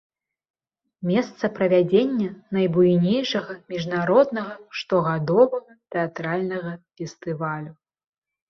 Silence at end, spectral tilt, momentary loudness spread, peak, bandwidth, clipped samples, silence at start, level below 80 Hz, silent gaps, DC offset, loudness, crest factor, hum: 0.75 s; -7 dB/octave; 14 LU; -4 dBFS; 6.8 kHz; under 0.1%; 1 s; -64 dBFS; none; under 0.1%; -23 LUFS; 18 dB; none